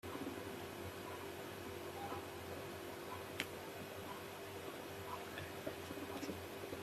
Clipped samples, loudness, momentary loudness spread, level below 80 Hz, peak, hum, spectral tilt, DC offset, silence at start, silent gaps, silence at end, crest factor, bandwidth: under 0.1%; -48 LUFS; 3 LU; -74 dBFS; -18 dBFS; none; -4 dB/octave; under 0.1%; 0.05 s; none; 0 s; 30 dB; 15.5 kHz